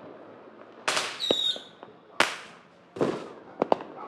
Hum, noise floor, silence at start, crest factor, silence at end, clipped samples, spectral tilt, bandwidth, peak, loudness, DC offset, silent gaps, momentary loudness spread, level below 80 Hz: none; -52 dBFS; 0 s; 30 dB; 0 s; under 0.1%; -2.5 dB/octave; 16 kHz; -2 dBFS; -28 LUFS; under 0.1%; none; 23 LU; -76 dBFS